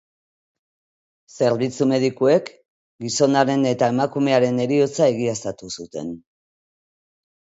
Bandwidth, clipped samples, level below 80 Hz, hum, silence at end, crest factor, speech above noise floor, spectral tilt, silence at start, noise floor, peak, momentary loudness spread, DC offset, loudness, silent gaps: 8 kHz; under 0.1%; -64 dBFS; none; 1.3 s; 20 dB; over 71 dB; -5.5 dB/octave; 1.35 s; under -90 dBFS; -2 dBFS; 14 LU; under 0.1%; -20 LUFS; 2.65-2.99 s